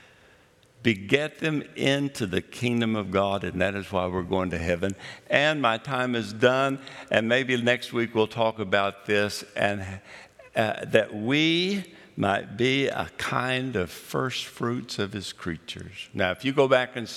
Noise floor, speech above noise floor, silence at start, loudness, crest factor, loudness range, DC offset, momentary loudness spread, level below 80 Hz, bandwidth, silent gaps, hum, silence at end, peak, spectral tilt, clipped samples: -58 dBFS; 32 dB; 0.8 s; -26 LUFS; 24 dB; 3 LU; under 0.1%; 10 LU; -60 dBFS; 15.5 kHz; none; none; 0 s; -2 dBFS; -5 dB/octave; under 0.1%